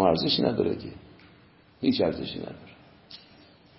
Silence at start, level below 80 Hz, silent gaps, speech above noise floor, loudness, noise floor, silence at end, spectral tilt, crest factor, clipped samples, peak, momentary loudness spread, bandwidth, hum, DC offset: 0 s; -54 dBFS; none; 29 dB; -27 LUFS; -56 dBFS; 0.6 s; -10 dB/octave; 22 dB; under 0.1%; -6 dBFS; 24 LU; 5.8 kHz; none; under 0.1%